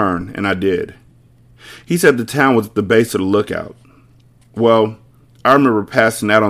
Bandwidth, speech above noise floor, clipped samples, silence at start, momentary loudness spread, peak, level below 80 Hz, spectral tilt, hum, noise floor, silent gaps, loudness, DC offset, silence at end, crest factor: 16 kHz; 34 dB; 0.1%; 0 s; 10 LU; 0 dBFS; -50 dBFS; -5.5 dB/octave; none; -49 dBFS; none; -15 LUFS; under 0.1%; 0 s; 16 dB